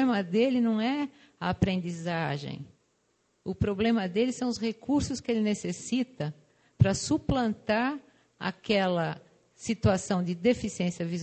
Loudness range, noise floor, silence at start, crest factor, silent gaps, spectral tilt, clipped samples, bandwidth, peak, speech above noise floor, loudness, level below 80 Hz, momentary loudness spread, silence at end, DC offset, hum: 2 LU; -72 dBFS; 0 s; 22 dB; none; -6 dB/octave; under 0.1%; 9 kHz; -8 dBFS; 44 dB; -29 LUFS; -48 dBFS; 10 LU; 0 s; under 0.1%; none